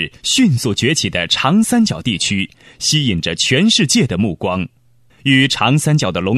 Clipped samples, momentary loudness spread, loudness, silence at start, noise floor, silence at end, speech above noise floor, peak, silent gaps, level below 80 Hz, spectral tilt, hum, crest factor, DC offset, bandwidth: under 0.1%; 9 LU; -14 LUFS; 0 s; -51 dBFS; 0 s; 36 dB; 0 dBFS; none; -46 dBFS; -4 dB/octave; none; 14 dB; under 0.1%; 14 kHz